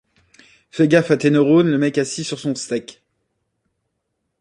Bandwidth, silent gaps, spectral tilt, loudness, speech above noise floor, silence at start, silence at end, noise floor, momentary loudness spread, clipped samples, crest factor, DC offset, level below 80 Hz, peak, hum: 11 kHz; none; -6 dB/octave; -17 LUFS; 58 dB; 0.75 s; 1.5 s; -74 dBFS; 11 LU; under 0.1%; 18 dB; under 0.1%; -62 dBFS; -2 dBFS; none